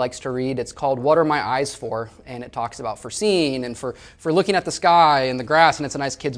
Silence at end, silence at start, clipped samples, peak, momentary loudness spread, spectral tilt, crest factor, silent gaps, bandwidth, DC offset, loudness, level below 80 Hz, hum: 0 s; 0 s; under 0.1%; 0 dBFS; 14 LU; -4.5 dB/octave; 20 dB; none; 10.5 kHz; under 0.1%; -20 LUFS; -52 dBFS; none